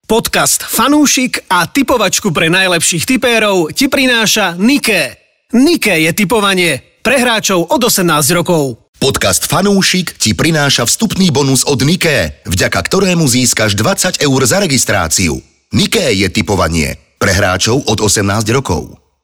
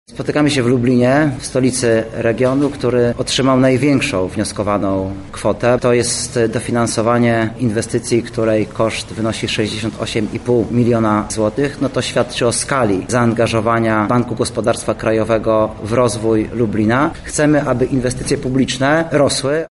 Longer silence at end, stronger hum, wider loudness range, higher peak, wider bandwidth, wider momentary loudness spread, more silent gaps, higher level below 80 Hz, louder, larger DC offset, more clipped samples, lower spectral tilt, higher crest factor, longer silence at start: first, 0.3 s vs 0.05 s; neither; about the same, 2 LU vs 2 LU; about the same, -2 dBFS vs -2 dBFS; first, 19.5 kHz vs 11.5 kHz; about the same, 5 LU vs 5 LU; first, 8.88-8.93 s vs none; about the same, -36 dBFS vs -40 dBFS; first, -11 LUFS vs -16 LUFS; first, 0.3% vs under 0.1%; neither; second, -3.5 dB/octave vs -5 dB/octave; about the same, 10 dB vs 12 dB; about the same, 0.1 s vs 0.1 s